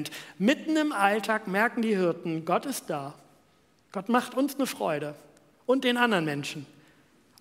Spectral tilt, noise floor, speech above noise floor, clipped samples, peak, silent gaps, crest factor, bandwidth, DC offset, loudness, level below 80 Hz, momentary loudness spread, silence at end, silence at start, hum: -4.5 dB/octave; -64 dBFS; 37 dB; under 0.1%; -6 dBFS; none; 22 dB; 16 kHz; under 0.1%; -27 LUFS; -78 dBFS; 13 LU; 0.75 s; 0 s; none